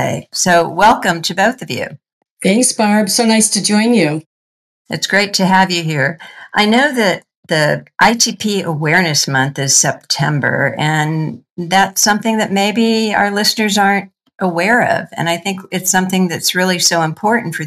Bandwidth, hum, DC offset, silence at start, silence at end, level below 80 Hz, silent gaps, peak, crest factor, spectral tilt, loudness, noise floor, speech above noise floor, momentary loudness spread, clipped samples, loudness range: 15 kHz; none; under 0.1%; 0 s; 0 s; -54 dBFS; 2.12-2.21 s, 2.31-2.37 s, 4.26-4.85 s, 7.36-7.43 s, 11.50-11.56 s; 0 dBFS; 14 dB; -3.5 dB/octave; -13 LUFS; under -90 dBFS; over 76 dB; 8 LU; under 0.1%; 1 LU